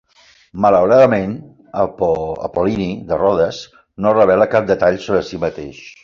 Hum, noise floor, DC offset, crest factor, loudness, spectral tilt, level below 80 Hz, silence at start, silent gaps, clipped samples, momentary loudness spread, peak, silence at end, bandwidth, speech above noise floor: none; -51 dBFS; under 0.1%; 14 dB; -16 LUFS; -7 dB/octave; -44 dBFS; 0.55 s; none; under 0.1%; 18 LU; -2 dBFS; 0.15 s; 7.2 kHz; 36 dB